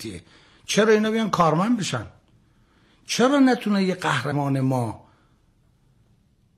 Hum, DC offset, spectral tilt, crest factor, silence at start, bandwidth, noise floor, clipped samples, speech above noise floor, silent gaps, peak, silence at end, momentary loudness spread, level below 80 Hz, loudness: none; under 0.1%; -5.5 dB/octave; 16 dB; 0 s; 14 kHz; -61 dBFS; under 0.1%; 40 dB; none; -8 dBFS; 1.6 s; 18 LU; -62 dBFS; -21 LUFS